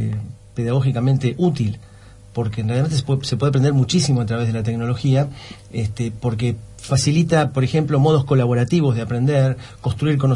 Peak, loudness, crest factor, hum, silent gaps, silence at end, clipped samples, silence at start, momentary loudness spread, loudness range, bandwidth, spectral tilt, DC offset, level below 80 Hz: -4 dBFS; -19 LUFS; 14 dB; none; none; 0 s; under 0.1%; 0 s; 10 LU; 3 LU; 11.5 kHz; -6.5 dB/octave; under 0.1%; -46 dBFS